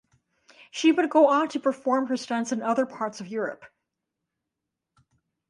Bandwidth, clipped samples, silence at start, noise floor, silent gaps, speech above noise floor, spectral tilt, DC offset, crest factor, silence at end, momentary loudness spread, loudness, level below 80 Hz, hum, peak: 11 kHz; under 0.1%; 0.75 s; -85 dBFS; none; 61 dB; -4 dB/octave; under 0.1%; 20 dB; 1.85 s; 13 LU; -25 LUFS; -78 dBFS; none; -6 dBFS